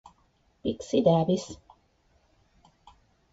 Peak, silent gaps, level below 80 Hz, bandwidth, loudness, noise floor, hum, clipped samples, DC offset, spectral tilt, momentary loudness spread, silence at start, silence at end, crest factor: -8 dBFS; none; -60 dBFS; 8 kHz; -26 LUFS; -67 dBFS; none; under 0.1%; under 0.1%; -7 dB/octave; 19 LU; 0.65 s; 1.75 s; 22 dB